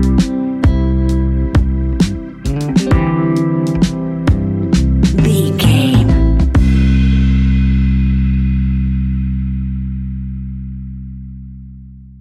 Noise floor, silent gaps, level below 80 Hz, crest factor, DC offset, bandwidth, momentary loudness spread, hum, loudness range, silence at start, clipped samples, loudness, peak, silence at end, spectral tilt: -34 dBFS; none; -18 dBFS; 14 dB; under 0.1%; 13 kHz; 14 LU; none; 7 LU; 0 s; under 0.1%; -14 LUFS; 0 dBFS; 0 s; -7.5 dB/octave